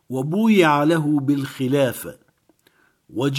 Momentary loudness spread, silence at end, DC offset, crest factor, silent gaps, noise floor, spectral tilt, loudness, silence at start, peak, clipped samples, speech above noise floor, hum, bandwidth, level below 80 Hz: 16 LU; 0 s; under 0.1%; 18 dB; none; -61 dBFS; -6.5 dB/octave; -19 LUFS; 0.1 s; -2 dBFS; under 0.1%; 42 dB; none; 17 kHz; -66 dBFS